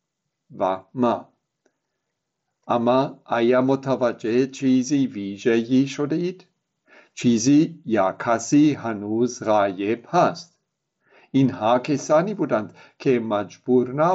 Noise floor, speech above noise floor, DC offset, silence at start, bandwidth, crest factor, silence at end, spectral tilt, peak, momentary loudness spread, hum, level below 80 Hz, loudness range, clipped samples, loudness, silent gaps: -79 dBFS; 58 dB; under 0.1%; 0.5 s; 8 kHz; 16 dB; 0 s; -6 dB/octave; -6 dBFS; 8 LU; none; -68 dBFS; 3 LU; under 0.1%; -22 LUFS; none